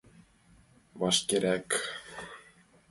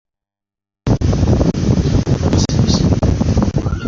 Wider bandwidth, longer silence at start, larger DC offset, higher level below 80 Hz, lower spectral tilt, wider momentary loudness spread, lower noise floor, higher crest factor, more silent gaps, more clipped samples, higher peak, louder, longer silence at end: first, 12 kHz vs 7.6 kHz; about the same, 0.95 s vs 0.85 s; neither; second, -66 dBFS vs -22 dBFS; second, -2.5 dB/octave vs -7 dB/octave; first, 19 LU vs 3 LU; second, -61 dBFS vs -87 dBFS; first, 22 dB vs 12 dB; neither; neither; second, -12 dBFS vs -2 dBFS; second, -29 LUFS vs -15 LUFS; first, 0.5 s vs 0 s